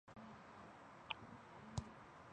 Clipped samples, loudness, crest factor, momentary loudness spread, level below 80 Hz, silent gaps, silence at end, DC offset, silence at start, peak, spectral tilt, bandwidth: under 0.1%; -54 LUFS; 30 dB; 9 LU; -66 dBFS; none; 0 s; under 0.1%; 0.05 s; -24 dBFS; -4.5 dB/octave; 9.6 kHz